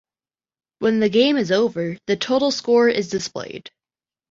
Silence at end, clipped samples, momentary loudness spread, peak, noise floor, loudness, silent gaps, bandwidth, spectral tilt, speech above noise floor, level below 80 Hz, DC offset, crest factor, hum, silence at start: 0.6 s; under 0.1%; 12 LU; -4 dBFS; under -90 dBFS; -19 LUFS; none; 7.8 kHz; -4.5 dB/octave; over 71 dB; -62 dBFS; under 0.1%; 16 dB; none; 0.8 s